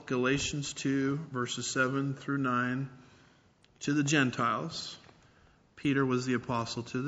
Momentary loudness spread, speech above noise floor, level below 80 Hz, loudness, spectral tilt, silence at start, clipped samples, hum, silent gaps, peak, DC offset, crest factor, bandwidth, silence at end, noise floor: 10 LU; 33 dB; -62 dBFS; -31 LUFS; -4.5 dB/octave; 0 s; under 0.1%; none; none; -12 dBFS; under 0.1%; 20 dB; 8 kHz; 0 s; -64 dBFS